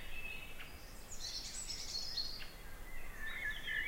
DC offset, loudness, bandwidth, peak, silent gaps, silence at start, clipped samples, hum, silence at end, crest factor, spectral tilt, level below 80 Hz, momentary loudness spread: under 0.1%; -44 LUFS; 16 kHz; -28 dBFS; none; 0 s; under 0.1%; none; 0 s; 16 dB; -1 dB/octave; -50 dBFS; 12 LU